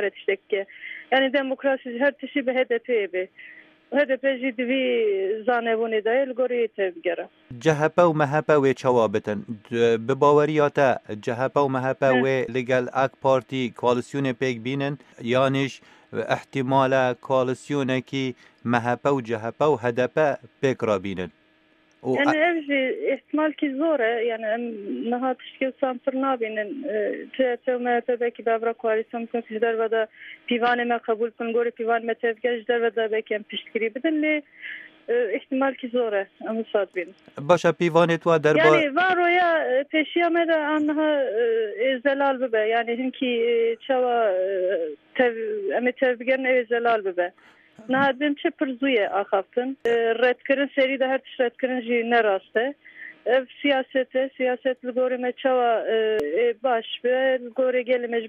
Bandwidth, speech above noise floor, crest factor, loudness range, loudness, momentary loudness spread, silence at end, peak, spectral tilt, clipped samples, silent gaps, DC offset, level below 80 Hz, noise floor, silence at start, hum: 9.4 kHz; 37 dB; 20 dB; 5 LU; -23 LUFS; 9 LU; 0 s; -4 dBFS; -6 dB/octave; under 0.1%; none; under 0.1%; -72 dBFS; -60 dBFS; 0 s; none